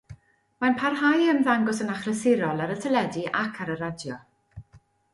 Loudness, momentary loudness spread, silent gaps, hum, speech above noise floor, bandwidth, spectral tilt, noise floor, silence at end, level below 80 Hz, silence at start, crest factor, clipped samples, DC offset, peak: -25 LUFS; 11 LU; none; none; 33 dB; 11.5 kHz; -5.5 dB/octave; -58 dBFS; 0.35 s; -62 dBFS; 0.1 s; 18 dB; under 0.1%; under 0.1%; -8 dBFS